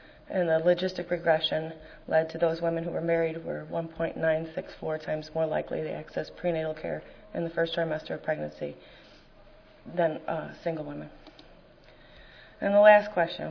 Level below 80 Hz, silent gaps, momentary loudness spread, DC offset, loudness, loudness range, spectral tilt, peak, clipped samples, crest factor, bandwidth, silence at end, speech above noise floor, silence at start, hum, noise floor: -58 dBFS; none; 13 LU; under 0.1%; -28 LUFS; 8 LU; -7 dB/octave; -6 dBFS; under 0.1%; 24 dB; 5.4 kHz; 0 s; 26 dB; 0.3 s; none; -54 dBFS